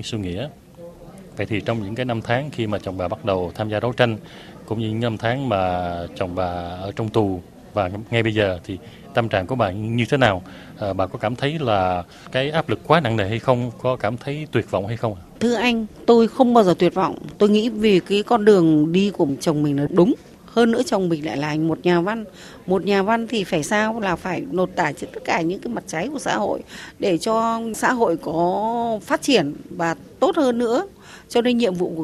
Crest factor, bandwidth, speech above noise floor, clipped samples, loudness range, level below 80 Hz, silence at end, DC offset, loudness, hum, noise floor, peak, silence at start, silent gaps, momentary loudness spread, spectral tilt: 20 dB; 14 kHz; 20 dB; under 0.1%; 6 LU; -52 dBFS; 0 s; under 0.1%; -21 LUFS; none; -41 dBFS; 0 dBFS; 0 s; none; 11 LU; -6 dB/octave